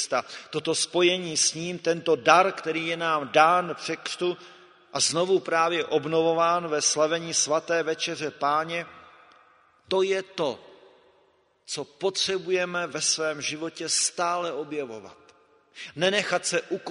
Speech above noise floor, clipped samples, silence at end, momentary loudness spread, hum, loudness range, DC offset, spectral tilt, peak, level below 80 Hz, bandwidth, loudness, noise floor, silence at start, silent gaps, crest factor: 39 dB; under 0.1%; 0 s; 12 LU; none; 7 LU; under 0.1%; -2.5 dB/octave; -2 dBFS; -74 dBFS; 11 kHz; -25 LUFS; -64 dBFS; 0 s; none; 24 dB